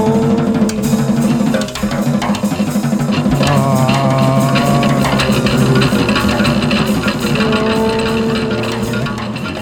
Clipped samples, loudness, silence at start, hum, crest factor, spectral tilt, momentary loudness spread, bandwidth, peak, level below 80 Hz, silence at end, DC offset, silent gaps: under 0.1%; -14 LUFS; 0 s; none; 14 dB; -6 dB/octave; 5 LU; 19.5 kHz; 0 dBFS; -34 dBFS; 0 s; under 0.1%; none